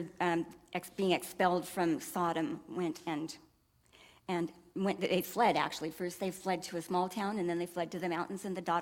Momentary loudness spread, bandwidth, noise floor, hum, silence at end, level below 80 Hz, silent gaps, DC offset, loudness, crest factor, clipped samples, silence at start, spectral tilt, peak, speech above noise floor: 8 LU; 18 kHz; -67 dBFS; none; 0 s; -72 dBFS; none; under 0.1%; -35 LUFS; 20 dB; under 0.1%; 0 s; -5 dB/octave; -14 dBFS; 33 dB